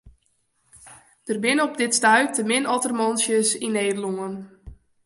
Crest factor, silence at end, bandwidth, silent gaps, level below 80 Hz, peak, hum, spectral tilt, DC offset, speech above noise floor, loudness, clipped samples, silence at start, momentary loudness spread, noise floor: 20 dB; 0.3 s; 11.5 kHz; none; -56 dBFS; -4 dBFS; none; -2.5 dB/octave; under 0.1%; 46 dB; -21 LUFS; under 0.1%; 0.05 s; 13 LU; -68 dBFS